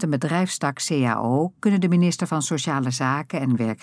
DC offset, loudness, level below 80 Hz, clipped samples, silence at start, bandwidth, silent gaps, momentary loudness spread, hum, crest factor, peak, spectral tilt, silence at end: under 0.1%; -22 LUFS; -72 dBFS; under 0.1%; 0 s; 11 kHz; none; 5 LU; none; 14 dB; -8 dBFS; -5.5 dB/octave; 0.1 s